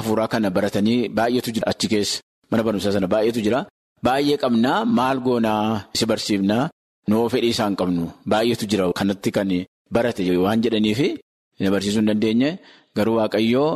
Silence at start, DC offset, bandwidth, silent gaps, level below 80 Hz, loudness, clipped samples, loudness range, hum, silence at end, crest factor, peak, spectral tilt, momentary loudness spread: 0 s; under 0.1%; 13.5 kHz; 2.23-2.42 s, 3.70-3.96 s, 6.72-7.02 s, 9.68-9.85 s, 11.22-11.51 s; -54 dBFS; -21 LUFS; under 0.1%; 1 LU; none; 0 s; 14 dB; -6 dBFS; -5.5 dB/octave; 6 LU